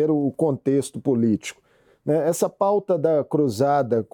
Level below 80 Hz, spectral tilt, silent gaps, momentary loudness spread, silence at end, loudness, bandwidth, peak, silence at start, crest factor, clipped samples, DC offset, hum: -70 dBFS; -7 dB/octave; none; 4 LU; 0.1 s; -22 LUFS; 19 kHz; -8 dBFS; 0 s; 14 dB; under 0.1%; under 0.1%; none